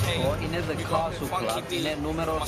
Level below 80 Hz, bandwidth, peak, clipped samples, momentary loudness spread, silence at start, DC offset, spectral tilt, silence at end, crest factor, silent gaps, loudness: -42 dBFS; 15.5 kHz; -10 dBFS; under 0.1%; 2 LU; 0 s; under 0.1%; -5 dB/octave; 0 s; 16 dB; none; -28 LUFS